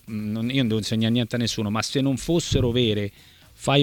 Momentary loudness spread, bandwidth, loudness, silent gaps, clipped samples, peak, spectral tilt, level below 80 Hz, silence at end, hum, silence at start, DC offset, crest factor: 7 LU; 18 kHz; -24 LUFS; none; under 0.1%; -6 dBFS; -5.5 dB/octave; -42 dBFS; 0 s; none; 0.05 s; under 0.1%; 18 dB